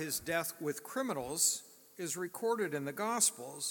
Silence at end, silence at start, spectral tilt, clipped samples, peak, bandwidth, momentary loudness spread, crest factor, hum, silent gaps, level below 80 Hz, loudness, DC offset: 0 s; 0 s; -2 dB/octave; under 0.1%; -16 dBFS; 17.5 kHz; 10 LU; 20 dB; none; none; -74 dBFS; -34 LUFS; under 0.1%